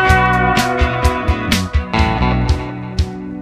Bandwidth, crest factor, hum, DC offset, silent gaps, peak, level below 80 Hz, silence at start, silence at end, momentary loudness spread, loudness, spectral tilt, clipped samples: 15.5 kHz; 16 dB; none; under 0.1%; none; 0 dBFS; -20 dBFS; 0 s; 0 s; 9 LU; -16 LUFS; -5.5 dB/octave; under 0.1%